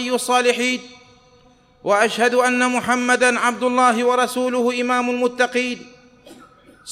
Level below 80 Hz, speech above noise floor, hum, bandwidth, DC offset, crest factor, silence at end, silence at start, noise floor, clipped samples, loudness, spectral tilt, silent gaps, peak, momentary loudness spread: -62 dBFS; 34 dB; none; 15.5 kHz; under 0.1%; 16 dB; 0 s; 0 s; -53 dBFS; under 0.1%; -18 LUFS; -2.5 dB/octave; none; -4 dBFS; 6 LU